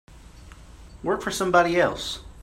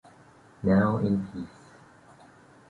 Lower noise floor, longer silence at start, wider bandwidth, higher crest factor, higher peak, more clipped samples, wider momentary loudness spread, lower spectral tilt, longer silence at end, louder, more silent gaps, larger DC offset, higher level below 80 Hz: second, -45 dBFS vs -55 dBFS; second, 0.1 s vs 0.6 s; first, 16 kHz vs 7.4 kHz; about the same, 20 dB vs 18 dB; first, -6 dBFS vs -12 dBFS; neither; second, 13 LU vs 17 LU; second, -4 dB/octave vs -9.5 dB/octave; second, 0 s vs 1.25 s; first, -23 LUFS vs -26 LUFS; neither; neither; first, -46 dBFS vs -54 dBFS